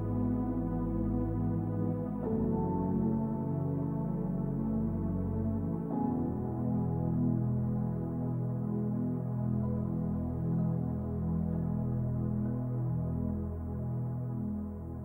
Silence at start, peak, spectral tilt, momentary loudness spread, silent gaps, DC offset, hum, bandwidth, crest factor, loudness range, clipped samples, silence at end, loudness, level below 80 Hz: 0 s; -20 dBFS; -13 dB/octave; 4 LU; none; under 0.1%; none; 2.4 kHz; 12 dB; 1 LU; under 0.1%; 0 s; -34 LUFS; -46 dBFS